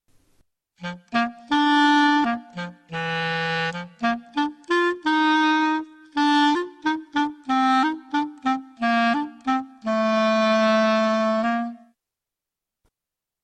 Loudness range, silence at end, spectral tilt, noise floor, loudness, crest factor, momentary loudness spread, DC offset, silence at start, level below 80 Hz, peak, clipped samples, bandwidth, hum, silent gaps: 2 LU; 1.65 s; -5 dB/octave; -87 dBFS; -22 LUFS; 14 dB; 10 LU; under 0.1%; 0.8 s; -66 dBFS; -8 dBFS; under 0.1%; 9.6 kHz; none; none